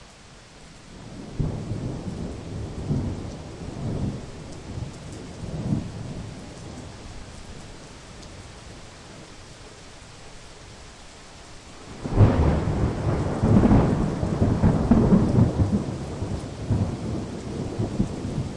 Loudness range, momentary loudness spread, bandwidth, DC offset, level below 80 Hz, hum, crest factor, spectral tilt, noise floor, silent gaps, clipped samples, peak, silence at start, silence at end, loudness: 22 LU; 24 LU; 11 kHz; under 0.1%; -36 dBFS; none; 20 dB; -8 dB/octave; -47 dBFS; none; under 0.1%; -6 dBFS; 0 s; 0 s; -25 LUFS